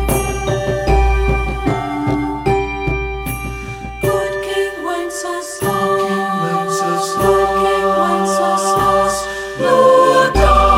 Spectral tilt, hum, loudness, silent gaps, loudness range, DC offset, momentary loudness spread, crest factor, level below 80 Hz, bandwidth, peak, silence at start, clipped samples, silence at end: -5 dB/octave; none; -16 LUFS; none; 6 LU; under 0.1%; 10 LU; 14 dB; -24 dBFS; 16.5 kHz; 0 dBFS; 0 s; under 0.1%; 0 s